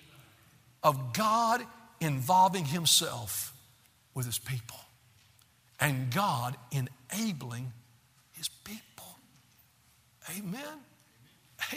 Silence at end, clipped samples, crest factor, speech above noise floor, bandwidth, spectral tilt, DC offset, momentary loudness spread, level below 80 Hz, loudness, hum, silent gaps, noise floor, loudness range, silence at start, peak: 0 s; under 0.1%; 26 dB; 34 dB; 16 kHz; -3.5 dB/octave; under 0.1%; 21 LU; -70 dBFS; -31 LUFS; none; none; -65 dBFS; 16 LU; 0.2 s; -8 dBFS